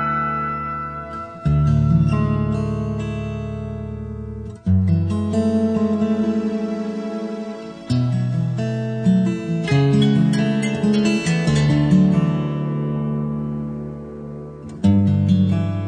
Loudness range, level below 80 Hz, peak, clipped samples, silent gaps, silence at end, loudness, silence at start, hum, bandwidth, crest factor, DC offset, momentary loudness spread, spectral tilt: 5 LU; -38 dBFS; -4 dBFS; under 0.1%; none; 0 s; -20 LUFS; 0 s; none; 10 kHz; 14 dB; under 0.1%; 14 LU; -7.5 dB/octave